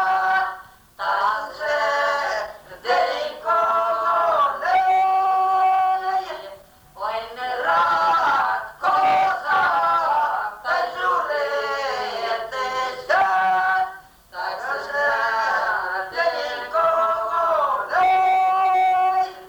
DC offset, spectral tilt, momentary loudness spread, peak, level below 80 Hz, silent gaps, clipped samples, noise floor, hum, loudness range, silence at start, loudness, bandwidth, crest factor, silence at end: under 0.1%; -2 dB/octave; 10 LU; -8 dBFS; -60 dBFS; none; under 0.1%; -44 dBFS; none; 3 LU; 0 s; -21 LUFS; over 20 kHz; 12 dB; 0 s